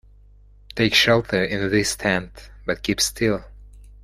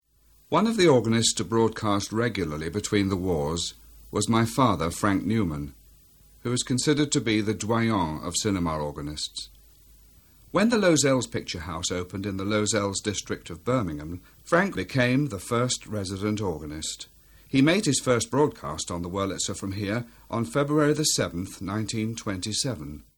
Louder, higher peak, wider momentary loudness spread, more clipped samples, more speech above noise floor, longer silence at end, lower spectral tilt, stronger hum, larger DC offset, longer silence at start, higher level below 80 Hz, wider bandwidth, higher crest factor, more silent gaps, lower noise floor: first, -20 LUFS vs -26 LUFS; first, -2 dBFS vs -6 dBFS; first, 14 LU vs 11 LU; neither; second, 28 dB vs 34 dB; about the same, 0.2 s vs 0.15 s; about the same, -3.5 dB/octave vs -4.5 dB/octave; first, 50 Hz at -40 dBFS vs none; neither; first, 0.75 s vs 0.5 s; first, -44 dBFS vs -50 dBFS; about the same, 16 kHz vs 17.5 kHz; about the same, 20 dB vs 20 dB; neither; second, -49 dBFS vs -60 dBFS